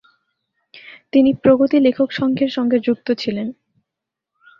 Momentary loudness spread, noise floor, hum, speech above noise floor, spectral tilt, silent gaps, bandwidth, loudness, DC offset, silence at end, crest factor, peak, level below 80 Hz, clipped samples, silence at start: 9 LU; -83 dBFS; none; 67 dB; -7.5 dB/octave; none; 6.4 kHz; -17 LUFS; under 0.1%; 1.1 s; 16 dB; -2 dBFS; -58 dBFS; under 0.1%; 0.75 s